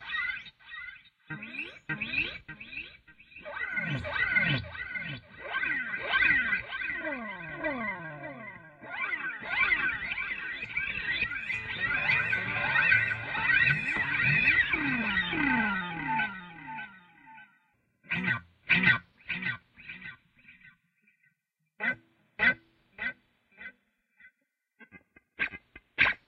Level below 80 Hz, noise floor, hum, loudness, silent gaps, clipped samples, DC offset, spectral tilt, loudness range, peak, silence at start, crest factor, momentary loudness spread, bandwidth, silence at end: -58 dBFS; -79 dBFS; none; -28 LUFS; none; under 0.1%; under 0.1%; -6 dB/octave; 10 LU; -10 dBFS; 0 s; 22 dB; 19 LU; 9 kHz; 0.1 s